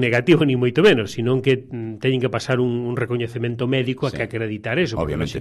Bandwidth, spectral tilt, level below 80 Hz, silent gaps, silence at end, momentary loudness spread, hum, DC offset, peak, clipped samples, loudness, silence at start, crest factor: 12.5 kHz; -6.5 dB/octave; -44 dBFS; none; 0 s; 8 LU; none; under 0.1%; -4 dBFS; under 0.1%; -20 LUFS; 0 s; 16 dB